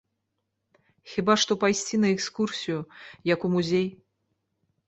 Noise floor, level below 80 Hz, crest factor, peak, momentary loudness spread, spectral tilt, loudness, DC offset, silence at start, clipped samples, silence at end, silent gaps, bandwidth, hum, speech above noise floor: -80 dBFS; -66 dBFS; 22 dB; -6 dBFS; 11 LU; -4.5 dB/octave; -26 LUFS; under 0.1%; 1.05 s; under 0.1%; 0.95 s; none; 8.2 kHz; none; 54 dB